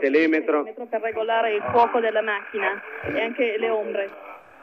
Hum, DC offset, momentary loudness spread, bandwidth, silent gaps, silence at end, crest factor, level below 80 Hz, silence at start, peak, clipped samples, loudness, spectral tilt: none; under 0.1%; 10 LU; 6.2 kHz; none; 0.2 s; 16 dB; -68 dBFS; 0 s; -8 dBFS; under 0.1%; -23 LUFS; -6.5 dB/octave